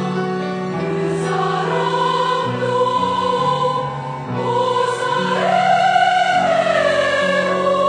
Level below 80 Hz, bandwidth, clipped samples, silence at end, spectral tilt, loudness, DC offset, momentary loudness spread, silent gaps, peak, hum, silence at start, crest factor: -58 dBFS; 10 kHz; under 0.1%; 0 s; -5 dB/octave; -17 LUFS; under 0.1%; 8 LU; none; -2 dBFS; none; 0 s; 14 dB